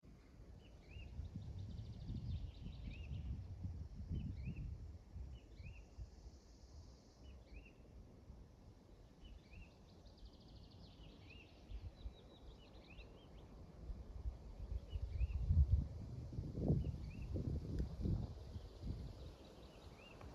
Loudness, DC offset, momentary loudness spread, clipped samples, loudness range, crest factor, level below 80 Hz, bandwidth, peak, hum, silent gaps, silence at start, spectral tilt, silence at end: -47 LUFS; under 0.1%; 19 LU; under 0.1%; 19 LU; 24 dB; -50 dBFS; 7.4 kHz; -24 dBFS; none; none; 0.05 s; -8.5 dB/octave; 0 s